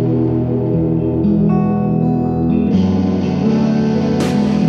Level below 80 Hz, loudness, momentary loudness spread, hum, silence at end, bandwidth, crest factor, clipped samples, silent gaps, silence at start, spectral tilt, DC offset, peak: -36 dBFS; -15 LUFS; 2 LU; none; 0 s; 9.8 kHz; 12 dB; under 0.1%; none; 0 s; -8.5 dB/octave; under 0.1%; -4 dBFS